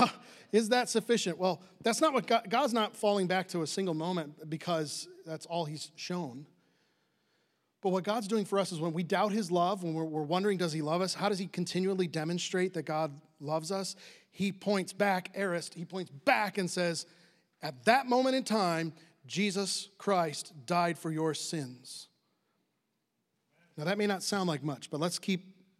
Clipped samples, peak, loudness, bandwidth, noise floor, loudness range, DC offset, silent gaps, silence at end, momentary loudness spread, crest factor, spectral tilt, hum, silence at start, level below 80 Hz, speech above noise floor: under 0.1%; -10 dBFS; -32 LUFS; 15 kHz; -81 dBFS; 7 LU; under 0.1%; none; 0.3 s; 12 LU; 24 dB; -4.5 dB/octave; none; 0 s; -88 dBFS; 49 dB